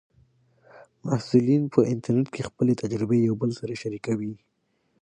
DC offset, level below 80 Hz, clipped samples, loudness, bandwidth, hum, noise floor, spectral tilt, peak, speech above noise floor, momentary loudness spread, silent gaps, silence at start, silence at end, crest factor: under 0.1%; -62 dBFS; under 0.1%; -25 LUFS; 9.8 kHz; none; -72 dBFS; -8 dB/octave; -4 dBFS; 48 dB; 11 LU; none; 0.75 s; 0.65 s; 20 dB